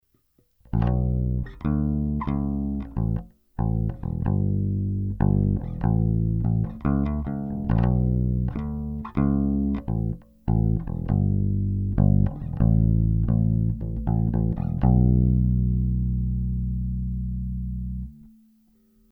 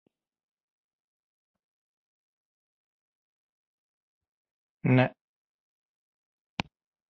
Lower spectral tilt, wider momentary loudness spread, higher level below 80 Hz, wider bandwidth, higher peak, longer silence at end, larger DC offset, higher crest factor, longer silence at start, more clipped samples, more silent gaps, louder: first, -12.5 dB/octave vs -6 dB/octave; second, 9 LU vs 14 LU; first, -30 dBFS vs -68 dBFS; second, 3.7 kHz vs 5.4 kHz; about the same, -8 dBFS vs -6 dBFS; second, 0.85 s vs 2 s; neither; second, 16 dB vs 30 dB; second, 0.75 s vs 4.85 s; neither; neither; first, -25 LUFS vs -28 LUFS